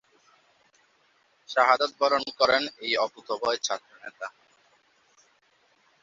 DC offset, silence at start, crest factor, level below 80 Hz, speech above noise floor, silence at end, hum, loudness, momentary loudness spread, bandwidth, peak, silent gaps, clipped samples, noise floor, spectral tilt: under 0.1%; 1.5 s; 24 dB; -72 dBFS; 40 dB; 1.75 s; none; -25 LUFS; 17 LU; 7.8 kHz; -4 dBFS; none; under 0.1%; -66 dBFS; -1 dB/octave